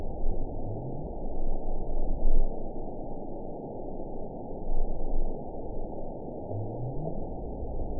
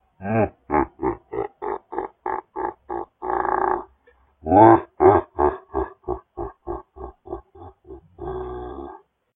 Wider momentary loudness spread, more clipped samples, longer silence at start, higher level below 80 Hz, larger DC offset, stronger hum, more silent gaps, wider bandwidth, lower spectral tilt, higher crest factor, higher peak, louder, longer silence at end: second, 6 LU vs 21 LU; neither; second, 0 s vs 0.2 s; first, -30 dBFS vs -44 dBFS; first, 0.3% vs under 0.1%; neither; neither; second, 1 kHz vs 3.8 kHz; first, -16 dB/octave vs -11 dB/octave; second, 16 dB vs 22 dB; second, -10 dBFS vs 0 dBFS; second, -37 LUFS vs -22 LUFS; second, 0 s vs 0.4 s